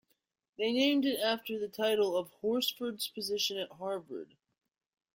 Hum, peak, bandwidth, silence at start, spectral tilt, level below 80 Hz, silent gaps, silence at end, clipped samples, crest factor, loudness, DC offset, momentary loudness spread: none; -16 dBFS; 16.5 kHz; 0.6 s; -3 dB/octave; -78 dBFS; none; 0.9 s; under 0.1%; 18 dB; -33 LUFS; under 0.1%; 10 LU